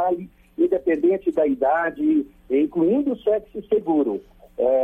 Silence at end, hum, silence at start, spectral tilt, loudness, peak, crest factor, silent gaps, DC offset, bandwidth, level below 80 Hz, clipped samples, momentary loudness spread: 0 s; none; 0 s; -9 dB/octave; -22 LUFS; -8 dBFS; 12 dB; none; under 0.1%; 3.7 kHz; -54 dBFS; under 0.1%; 6 LU